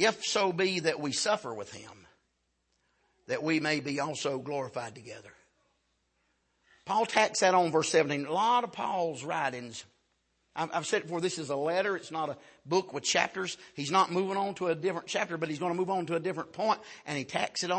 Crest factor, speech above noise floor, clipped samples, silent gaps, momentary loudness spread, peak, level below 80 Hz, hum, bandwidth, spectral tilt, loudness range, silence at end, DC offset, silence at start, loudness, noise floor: 24 dB; 47 dB; under 0.1%; none; 13 LU; -8 dBFS; -76 dBFS; none; 8.8 kHz; -3.5 dB/octave; 6 LU; 0 s; under 0.1%; 0 s; -30 LUFS; -77 dBFS